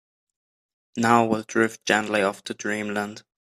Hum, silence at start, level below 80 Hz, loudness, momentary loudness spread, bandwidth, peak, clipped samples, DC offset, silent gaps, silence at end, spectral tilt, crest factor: none; 0.95 s; -68 dBFS; -23 LUFS; 11 LU; 14.5 kHz; -2 dBFS; under 0.1%; under 0.1%; none; 0.2 s; -4.5 dB/octave; 22 dB